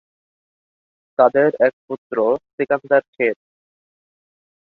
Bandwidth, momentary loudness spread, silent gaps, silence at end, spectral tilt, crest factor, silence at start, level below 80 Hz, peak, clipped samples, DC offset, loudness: 4.7 kHz; 12 LU; 1.73-1.88 s, 1.98-2.10 s, 2.53-2.58 s, 3.08-3.13 s; 1.45 s; -8.5 dB/octave; 20 dB; 1.2 s; -68 dBFS; -2 dBFS; under 0.1%; under 0.1%; -19 LUFS